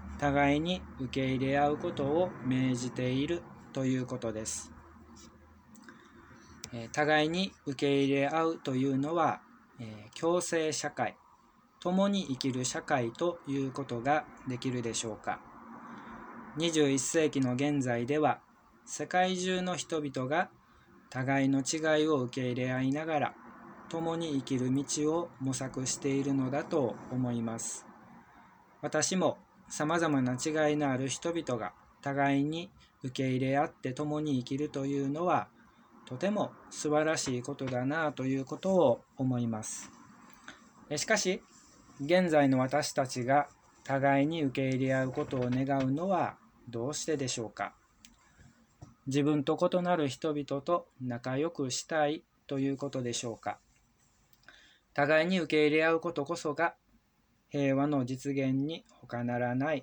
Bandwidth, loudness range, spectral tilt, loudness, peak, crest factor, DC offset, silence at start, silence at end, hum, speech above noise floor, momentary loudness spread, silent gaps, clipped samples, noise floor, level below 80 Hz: over 20 kHz; 4 LU; -5 dB/octave; -32 LUFS; -12 dBFS; 20 dB; under 0.1%; 0 s; 0 s; none; 40 dB; 13 LU; none; under 0.1%; -71 dBFS; -64 dBFS